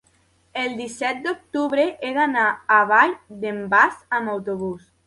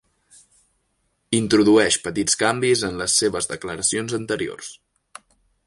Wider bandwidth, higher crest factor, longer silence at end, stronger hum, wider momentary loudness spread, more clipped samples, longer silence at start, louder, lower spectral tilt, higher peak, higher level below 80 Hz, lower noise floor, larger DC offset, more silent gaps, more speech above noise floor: about the same, 11.5 kHz vs 11.5 kHz; about the same, 20 dB vs 18 dB; second, 0.3 s vs 0.95 s; neither; about the same, 12 LU vs 11 LU; neither; second, 0.55 s vs 1.3 s; about the same, -21 LUFS vs -20 LUFS; first, -4.5 dB/octave vs -3 dB/octave; about the same, -2 dBFS vs -4 dBFS; second, -64 dBFS vs -54 dBFS; second, -61 dBFS vs -70 dBFS; neither; neither; second, 40 dB vs 49 dB